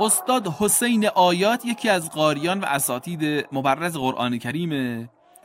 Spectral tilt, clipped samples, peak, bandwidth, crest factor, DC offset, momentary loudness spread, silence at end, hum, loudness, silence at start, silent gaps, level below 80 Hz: -3.5 dB/octave; under 0.1%; -4 dBFS; 16 kHz; 18 dB; under 0.1%; 8 LU; 0.35 s; none; -22 LUFS; 0 s; none; -62 dBFS